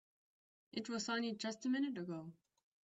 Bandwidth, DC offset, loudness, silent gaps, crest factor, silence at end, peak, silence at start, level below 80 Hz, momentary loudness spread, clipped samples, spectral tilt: 8.2 kHz; under 0.1%; -42 LUFS; none; 18 dB; 0.5 s; -24 dBFS; 0.75 s; -86 dBFS; 10 LU; under 0.1%; -4 dB/octave